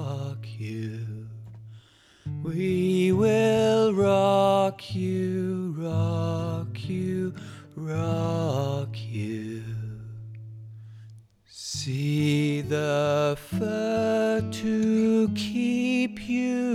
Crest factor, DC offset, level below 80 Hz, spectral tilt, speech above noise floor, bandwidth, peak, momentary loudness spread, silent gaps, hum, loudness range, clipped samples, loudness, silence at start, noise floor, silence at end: 16 dB; under 0.1%; -58 dBFS; -6.5 dB/octave; 29 dB; 14.5 kHz; -10 dBFS; 19 LU; none; none; 8 LU; under 0.1%; -26 LUFS; 0 s; -54 dBFS; 0 s